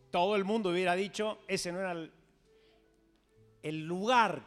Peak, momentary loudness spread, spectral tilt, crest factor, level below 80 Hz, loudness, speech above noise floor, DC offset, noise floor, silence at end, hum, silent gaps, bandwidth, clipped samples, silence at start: -12 dBFS; 13 LU; -4.5 dB/octave; 22 dB; -70 dBFS; -32 LUFS; 37 dB; under 0.1%; -69 dBFS; 0 s; none; none; 14 kHz; under 0.1%; 0.15 s